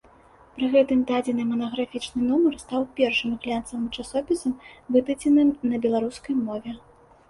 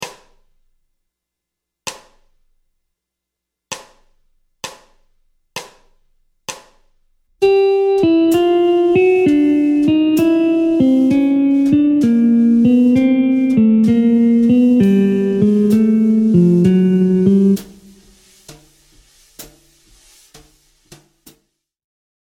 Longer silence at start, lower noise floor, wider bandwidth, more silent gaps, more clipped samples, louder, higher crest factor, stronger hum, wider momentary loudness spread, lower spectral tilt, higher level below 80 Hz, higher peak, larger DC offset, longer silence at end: first, 0.55 s vs 0 s; second, -53 dBFS vs -81 dBFS; second, 11.5 kHz vs 16 kHz; neither; neither; second, -24 LUFS vs -13 LUFS; about the same, 18 dB vs 14 dB; neither; second, 11 LU vs 19 LU; second, -5 dB/octave vs -7.5 dB/octave; about the same, -56 dBFS vs -52 dBFS; second, -8 dBFS vs 0 dBFS; neither; second, 0.5 s vs 2.8 s